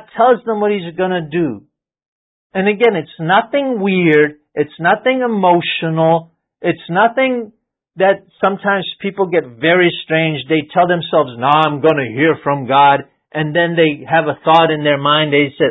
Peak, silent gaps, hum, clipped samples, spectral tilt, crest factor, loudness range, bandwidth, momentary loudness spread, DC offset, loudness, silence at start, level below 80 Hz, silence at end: 0 dBFS; 2.08-2.50 s; none; under 0.1%; -8.5 dB/octave; 14 dB; 3 LU; 4.8 kHz; 8 LU; under 0.1%; -14 LUFS; 0.15 s; -60 dBFS; 0 s